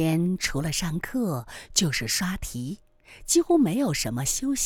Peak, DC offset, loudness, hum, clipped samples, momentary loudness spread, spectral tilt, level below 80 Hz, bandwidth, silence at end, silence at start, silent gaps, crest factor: -6 dBFS; under 0.1%; -25 LUFS; none; under 0.1%; 12 LU; -4 dB/octave; -44 dBFS; 20 kHz; 0 s; 0 s; none; 20 dB